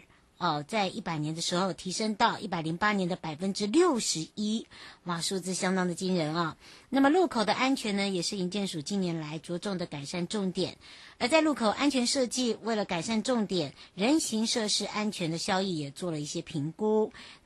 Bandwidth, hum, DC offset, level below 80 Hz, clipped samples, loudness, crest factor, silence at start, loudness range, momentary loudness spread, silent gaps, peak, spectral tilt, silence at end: 12.5 kHz; none; under 0.1%; -66 dBFS; under 0.1%; -30 LUFS; 20 dB; 0.4 s; 3 LU; 9 LU; none; -10 dBFS; -4 dB/octave; 0.1 s